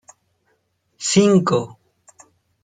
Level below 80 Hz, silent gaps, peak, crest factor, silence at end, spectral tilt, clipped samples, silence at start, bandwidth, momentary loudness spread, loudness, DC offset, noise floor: -60 dBFS; none; -2 dBFS; 18 dB; 0.95 s; -5 dB/octave; under 0.1%; 1 s; 9.6 kHz; 13 LU; -17 LUFS; under 0.1%; -67 dBFS